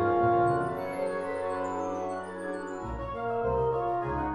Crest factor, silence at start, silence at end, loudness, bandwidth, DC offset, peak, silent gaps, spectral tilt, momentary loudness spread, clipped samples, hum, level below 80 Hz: 14 dB; 0 s; 0 s; -30 LUFS; 12 kHz; under 0.1%; -14 dBFS; none; -7.5 dB/octave; 11 LU; under 0.1%; none; -48 dBFS